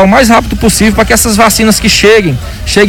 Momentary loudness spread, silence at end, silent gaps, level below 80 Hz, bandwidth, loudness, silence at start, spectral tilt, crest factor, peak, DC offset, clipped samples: 6 LU; 0 s; none; -20 dBFS; 19 kHz; -6 LUFS; 0 s; -3.5 dB/octave; 6 dB; 0 dBFS; under 0.1%; 2%